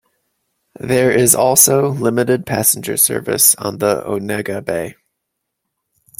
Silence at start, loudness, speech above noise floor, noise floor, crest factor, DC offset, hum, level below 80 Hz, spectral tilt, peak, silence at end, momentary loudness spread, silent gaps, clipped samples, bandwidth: 0.85 s; -14 LUFS; 61 dB; -76 dBFS; 16 dB; under 0.1%; none; -54 dBFS; -3.5 dB/octave; 0 dBFS; 1.3 s; 12 LU; none; under 0.1%; 17 kHz